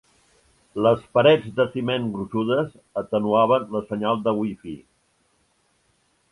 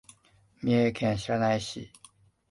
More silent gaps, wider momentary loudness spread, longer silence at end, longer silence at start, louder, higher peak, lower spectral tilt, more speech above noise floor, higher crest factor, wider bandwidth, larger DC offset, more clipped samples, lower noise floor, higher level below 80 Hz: neither; about the same, 13 LU vs 15 LU; first, 1.55 s vs 0.65 s; first, 0.75 s vs 0.6 s; first, -22 LUFS vs -28 LUFS; first, -2 dBFS vs -14 dBFS; first, -7.5 dB/octave vs -6 dB/octave; first, 44 dB vs 36 dB; first, 22 dB vs 16 dB; about the same, 11.5 kHz vs 11.5 kHz; neither; neither; about the same, -66 dBFS vs -63 dBFS; about the same, -60 dBFS vs -58 dBFS